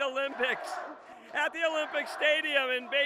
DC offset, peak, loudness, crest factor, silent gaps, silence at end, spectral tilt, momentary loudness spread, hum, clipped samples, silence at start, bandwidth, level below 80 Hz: under 0.1%; -12 dBFS; -29 LUFS; 18 dB; none; 0 s; -1 dB/octave; 13 LU; none; under 0.1%; 0 s; 15 kHz; -80 dBFS